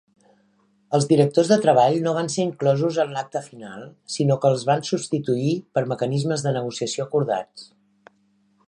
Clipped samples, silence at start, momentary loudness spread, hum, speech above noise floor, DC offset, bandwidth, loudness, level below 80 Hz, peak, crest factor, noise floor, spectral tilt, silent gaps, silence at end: under 0.1%; 0.9 s; 14 LU; none; 42 dB; under 0.1%; 11 kHz; -22 LUFS; -70 dBFS; -4 dBFS; 18 dB; -63 dBFS; -6 dB/octave; none; 1.05 s